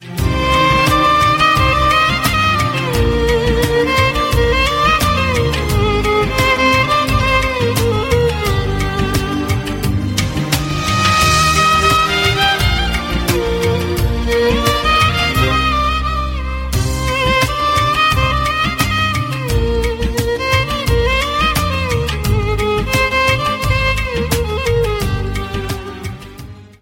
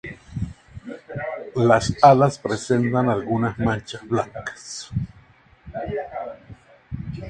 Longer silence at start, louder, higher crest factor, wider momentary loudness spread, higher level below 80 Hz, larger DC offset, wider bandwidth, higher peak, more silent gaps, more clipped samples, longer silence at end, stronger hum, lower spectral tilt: about the same, 0 s vs 0.05 s; first, -14 LUFS vs -22 LUFS; second, 14 dB vs 22 dB; second, 7 LU vs 21 LU; first, -24 dBFS vs -46 dBFS; neither; first, 16.5 kHz vs 9.8 kHz; about the same, 0 dBFS vs 0 dBFS; neither; neither; first, 0.15 s vs 0 s; neither; second, -4.5 dB/octave vs -6.5 dB/octave